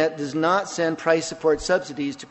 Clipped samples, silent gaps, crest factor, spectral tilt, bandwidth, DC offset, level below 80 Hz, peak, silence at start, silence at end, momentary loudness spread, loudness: under 0.1%; none; 18 dB; -4 dB/octave; 8.4 kHz; under 0.1%; -52 dBFS; -6 dBFS; 0 s; 0.05 s; 5 LU; -23 LUFS